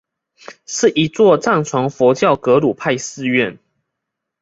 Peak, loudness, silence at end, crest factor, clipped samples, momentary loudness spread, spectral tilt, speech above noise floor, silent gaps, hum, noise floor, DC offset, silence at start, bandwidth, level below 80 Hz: 0 dBFS; -15 LUFS; 0.9 s; 16 dB; under 0.1%; 7 LU; -5 dB/octave; 64 dB; none; none; -79 dBFS; under 0.1%; 0.5 s; 8 kHz; -58 dBFS